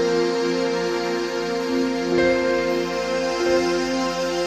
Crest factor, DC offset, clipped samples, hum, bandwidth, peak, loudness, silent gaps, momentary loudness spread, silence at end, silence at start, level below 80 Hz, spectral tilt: 14 dB; under 0.1%; under 0.1%; none; 14 kHz; -8 dBFS; -22 LUFS; none; 4 LU; 0 s; 0 s; -48 dBFS; -4.5 dB/octave